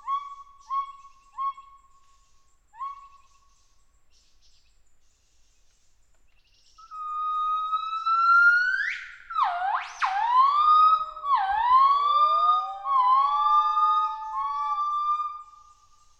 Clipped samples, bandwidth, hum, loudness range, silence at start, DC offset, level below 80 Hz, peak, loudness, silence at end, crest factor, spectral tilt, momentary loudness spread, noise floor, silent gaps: under 0.1%; 8 kHz; none; 16 LU; 0.05 s; under 0.1%; -62 dBFS; -10 dBFS; -23 LUFS; 0.75 s; 16 dB; 0.5 dB/octave; 17 LU; -61 dBFS; none